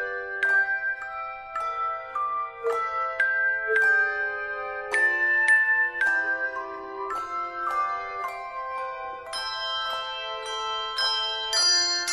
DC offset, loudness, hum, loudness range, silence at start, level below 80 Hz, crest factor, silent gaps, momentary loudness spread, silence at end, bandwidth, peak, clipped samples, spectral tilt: under 0.1%; -25 LUFS; none; 8 LU; 0 s; -62 dBFS; 16 dB; none; 13 LU; 0 s; 13.5 kHz; -10 dBFS; under 0.1%; 1.5 dB/octave